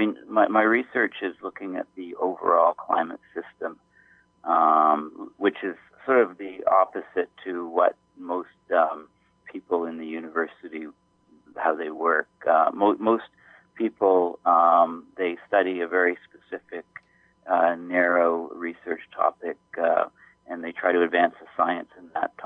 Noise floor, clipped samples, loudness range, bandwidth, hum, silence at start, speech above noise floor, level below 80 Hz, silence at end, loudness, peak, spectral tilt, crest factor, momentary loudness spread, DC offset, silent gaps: -59 dBFS; under 0.1%; 5 LU; 4 kHz; none; 0 s; 35 dB; -76 dBFS; 0 s; -24 LUFS; -8 dBFS; -7.5 dB/octave; 18 dB; 16 LU; under 0.1%; none